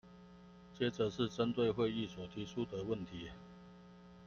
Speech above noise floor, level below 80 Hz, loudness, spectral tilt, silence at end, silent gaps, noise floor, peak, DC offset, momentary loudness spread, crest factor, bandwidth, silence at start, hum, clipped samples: 20 dB; -66 dBFS; -39 LUFS; -6.5 dB/octave; 0 s; none; -58 dBFS; -22 dBFS; under 0.1%; 24 LU; 18 dB; 7.2 kHz; 0.05 s; 60 Hz at -55 dBFS; under 0.1%